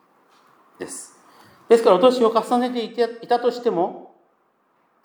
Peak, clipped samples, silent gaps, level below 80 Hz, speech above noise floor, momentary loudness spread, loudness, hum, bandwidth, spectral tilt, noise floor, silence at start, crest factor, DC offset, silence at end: -2 dBFS; under 0.1%; none; -80 dBFS; 45 dB; 19 LU; -19 LUFS; none; 19.5 kHz; -4.5 dB/octave; -64 dBFS; 0.8 s; 20 dB; under 0.1%; 1 s